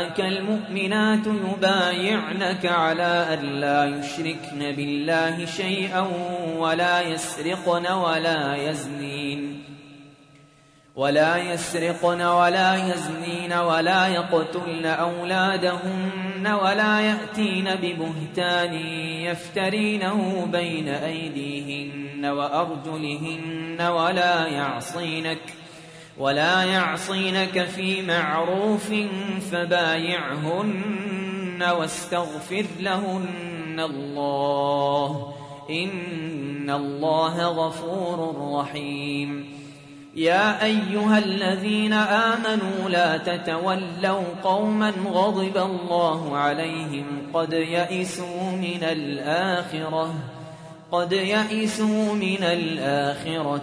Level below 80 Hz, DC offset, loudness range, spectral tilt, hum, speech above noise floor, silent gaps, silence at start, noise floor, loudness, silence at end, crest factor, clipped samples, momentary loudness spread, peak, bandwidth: -66 dBFS; under 0.1%; 5 LU; -5 dB/octave; none; 31 dB; none; 0 s; -55 dBFS; -24 LUFS; 0 s; 18 dB; under 0.1%; 9 LU; -6 dBFS; 11 kHz